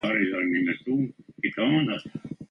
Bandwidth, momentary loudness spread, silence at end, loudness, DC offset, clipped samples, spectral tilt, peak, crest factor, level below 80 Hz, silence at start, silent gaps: 6 kHz; 10 LU; 0.05 s; -26 LUFS; under 0.1%; under 0.1%; -7.5 dB/octave; -10 dBFS; 16 dB; -66 dBFS; 0.05 s; none